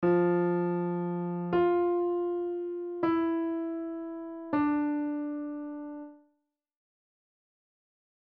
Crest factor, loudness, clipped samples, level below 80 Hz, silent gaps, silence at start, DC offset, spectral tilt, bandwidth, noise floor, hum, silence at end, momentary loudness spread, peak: 16 dB; -30 LUFS; under 0.1%; -68 dBFS; none; 0 s; under 0.1%; -8 dB/octave; 4.4 kHz; -78 dBFS; none; 2.1 s; 13 LU; -16 dBFS